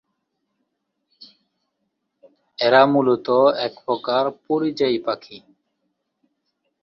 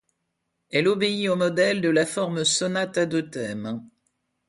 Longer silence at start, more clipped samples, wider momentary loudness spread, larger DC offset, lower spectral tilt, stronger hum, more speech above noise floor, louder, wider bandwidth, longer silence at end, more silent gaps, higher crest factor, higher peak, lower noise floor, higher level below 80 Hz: first, 2.6 s vs 0.7 s; neither; about the same, 11 LU vs 10 LU; neither; first, -6.5 dB/octave vs -4 dB/octave; neither; about the same, 57 dB vs 54 dB; first, -19 LUFS vs -23 LUFS; second, 7 kHz vs 11.5 kHz; first, 1.45 s vs 0.65 s; neither; about the same, 20 dB vs 18 dB; first, -2 dBFS vs -8 dBFS; about the same, -75 dBFS vs -77 dBFS; about the same, -68 dBFS vs -66 dBFS